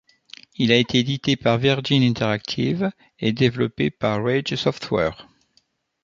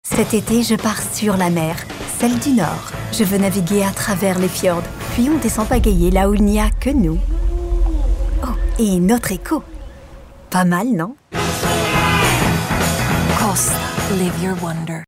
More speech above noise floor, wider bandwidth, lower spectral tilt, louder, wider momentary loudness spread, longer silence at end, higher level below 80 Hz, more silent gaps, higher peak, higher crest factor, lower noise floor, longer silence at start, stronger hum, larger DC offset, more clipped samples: first, 44 dB vs 22 dB; second, 7.6 kHz vs 16.5 kHz; about the same, -6 dB/octave vs -5 dB/octave; second, -21 LUFS vs -17 LUFS; about the same, 7 LU vs 8 LU; first, 0.8 s vs 0.05 s; second, -52 dBFS vs -24 dBFS; neither; about the same, -2 dBFS vs -4 dBFS; first, 20 dB vs 14 dB; first, -65 dBFS vs -38 dBFS; first, 0.6 s vs 0.05 s; neither; neither; neither